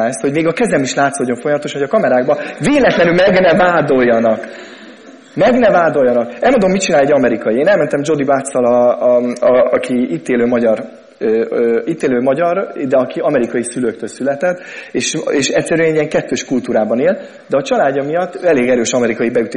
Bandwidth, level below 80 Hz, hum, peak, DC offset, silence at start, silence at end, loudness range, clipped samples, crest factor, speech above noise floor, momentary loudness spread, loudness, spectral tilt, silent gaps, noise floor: 10.5 kHz; -48 dBFS; none; 0 dBFS; under 0.1%; 0 s; 0 s; 4 LU; under 0.1%; 12 dB; 24 dB; 8 LU; -14 LUFS; -5 dB/octave; none; -37 dBFS